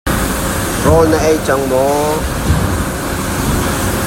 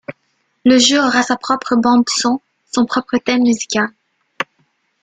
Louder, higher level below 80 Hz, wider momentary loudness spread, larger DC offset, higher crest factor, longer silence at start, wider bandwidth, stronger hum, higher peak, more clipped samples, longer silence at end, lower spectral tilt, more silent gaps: about the same, -14 LUFS vs -15 LUFS; first, -24 dBFS vs -58 dBFS; second, 7 LU vs 15 LU; neither; about the same, 14 dB vs 16 dB; about the same, 0.05 s vs 0.1 s; first, 16.5 kHz vs 9.4 kHz; neither; about the same, 0 dBFS vs 0 dBFS; neither; second, 0 s vs 0.6 s; first, -5 dB/octave vs -2.5 dB/octave; neither